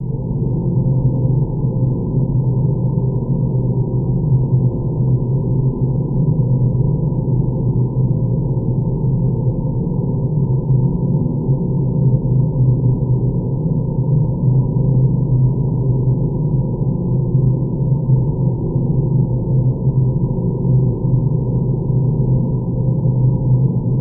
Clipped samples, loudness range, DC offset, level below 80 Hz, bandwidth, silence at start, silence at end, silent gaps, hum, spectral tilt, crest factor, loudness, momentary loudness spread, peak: under 0.1%; 1 LU; under 0.1%; -30 dBFS; 1.1 kHz; 0 s; 0 s; none; none; -18 dB/octave; 12 dB; -17 LUFS; 3 LU; -4 dBFS